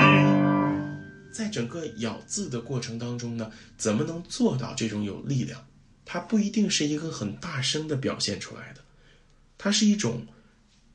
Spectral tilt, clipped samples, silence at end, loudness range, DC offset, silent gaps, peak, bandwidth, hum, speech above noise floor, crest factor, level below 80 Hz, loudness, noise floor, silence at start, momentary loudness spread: -4.5 dB/octave; under 0.1%; 0.7 s; 3 LU; under 0.1%; none; -4 dBFS; 10.5 kHz; none; 30 dB; 22 dB; -60 dBFS; -27 LUFS; -59 dBFS; 0 s; 14 LU